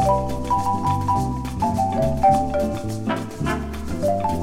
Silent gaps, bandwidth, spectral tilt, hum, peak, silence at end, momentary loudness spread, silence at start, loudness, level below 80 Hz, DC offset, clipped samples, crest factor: none; 16.5 kHz; -7 dB/octave; none; -6 dBFS; 0 s; 8 LU; 0 s; -22 LUFS; -34 dBFS; under 0.1%; under 0.1%; 14 dB